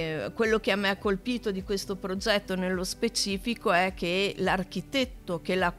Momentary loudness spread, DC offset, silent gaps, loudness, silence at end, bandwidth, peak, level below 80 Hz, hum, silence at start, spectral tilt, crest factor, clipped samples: 7 LU; under 0.1%; none; -28 LUFS; 0 s; 15.5 kHz; -10 dBFS; -48 dBFS; none; 0 s; -4 dB/octave; 18 dB; under 0.1%